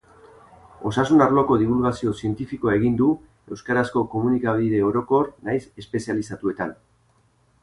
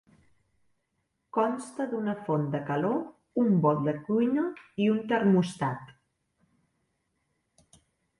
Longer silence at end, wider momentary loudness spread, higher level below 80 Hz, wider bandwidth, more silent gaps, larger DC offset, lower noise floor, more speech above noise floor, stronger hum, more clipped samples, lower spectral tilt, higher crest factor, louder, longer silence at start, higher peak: second, 0.9 s vs 2.3 s; first, 12 LU vs 9 LU; first, -50 dBFS vs -72 dBFS; about the same, 11.5 kHz vs 11.5 kHz; neither; neither; second, -61 dBFS vs -78 dBFS; second, 40 dB vs 51 dB; neither; neither; about the same, -7.5 dB/octave vs -7.5 dB/octave; about the same, 18 dB vs 18 dB; first, -22 LUFS vs -28 LUFS; second, 0.8 s vs 1.35 s; first, -6 dBFS vs -12 dBFS